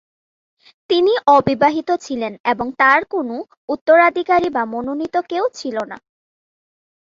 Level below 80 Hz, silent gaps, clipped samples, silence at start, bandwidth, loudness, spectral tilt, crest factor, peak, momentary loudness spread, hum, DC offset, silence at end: -58 dBFS; 2.40-2.44 s, 3.57-3.68 s, 3.81-3.86 s; under 0.1%; 0.9 s; 7.6 kHz; -17 LUFS; -5 dB/octave; 16 dB; -2 dBFS; 13 LU; none; under 0.1%; 1.05 s